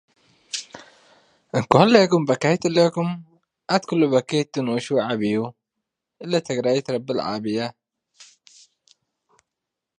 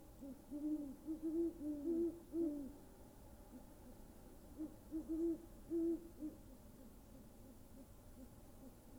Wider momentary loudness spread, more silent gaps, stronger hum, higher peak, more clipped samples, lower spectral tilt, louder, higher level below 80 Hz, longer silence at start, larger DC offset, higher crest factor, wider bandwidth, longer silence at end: second, 15 LU vs 19 LU; neither; neither; first, 0 dBFS vs -32 dBFS; neither; second, -5.5 dB/octave vs -7.5 dB/octave; first, -21 LUFS vs -45 LUFS; about the same, -64 dBFS vs -64 dBFS; first, 0.55 s vs 0 s; neither; first, 22 dB vs 16 dB; second, 10.5 kHz vs over 20 kHz; first, 1.75 s vs 0 s